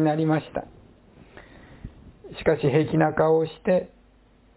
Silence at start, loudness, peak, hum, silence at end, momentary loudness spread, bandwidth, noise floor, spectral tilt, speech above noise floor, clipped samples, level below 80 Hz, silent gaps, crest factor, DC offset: 0 s; -23 LUFS; -6 dBFS; none; 0.7 s; 24 LU; 4 kHz; -57 dBFS; -11.5 dB/octave; 34 dB; under 0.1%; -52 dBFS; none; 18 dB; under 0.1%